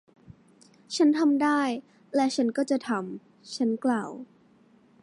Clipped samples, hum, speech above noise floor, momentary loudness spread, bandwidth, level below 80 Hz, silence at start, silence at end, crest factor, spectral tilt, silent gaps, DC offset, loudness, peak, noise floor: under 0.1%; none; 34 dB; 17 LU; 11.5 kHz; -74 dBFS; 0.3 s; 0.8 s; 16 dB; -4.5 dB/octave; none; under 0.1%; -26 LUFS; -12 dBFS; -59 dBFS